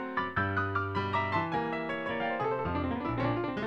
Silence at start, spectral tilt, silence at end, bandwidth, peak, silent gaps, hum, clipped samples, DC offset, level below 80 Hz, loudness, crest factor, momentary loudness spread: 0 s; -8 dB/octave; 0 s; 7.2 kHz; -16 dBFS; none; none; under 0.1%; under 0.1%; -54 dBFS; -32 LUFS; 14 dB; 3 LU